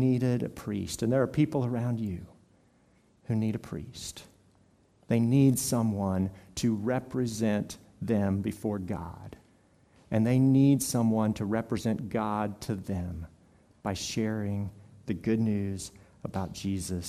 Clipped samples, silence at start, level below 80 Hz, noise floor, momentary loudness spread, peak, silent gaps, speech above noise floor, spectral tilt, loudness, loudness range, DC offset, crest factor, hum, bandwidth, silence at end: under 0.1%; 0 s; -58 dBFS; -64 dBFS; 16 LU; -12 dBFS; none; 36 dB; -6.5 dB/octave; -30 LUFS; 6 LU; under 0.1%; 18 dB; none; 15.5 kHz; 0 s